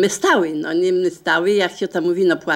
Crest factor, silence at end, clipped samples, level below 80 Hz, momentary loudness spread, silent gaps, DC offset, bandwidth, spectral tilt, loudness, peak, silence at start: 14 dB; 0 s; under 0.1%; -66 dBFS; 4 LU; none; under 0.1%; 15 kHz; -4 dB/octave; -18 LUFS; -2 dBFS; 0 s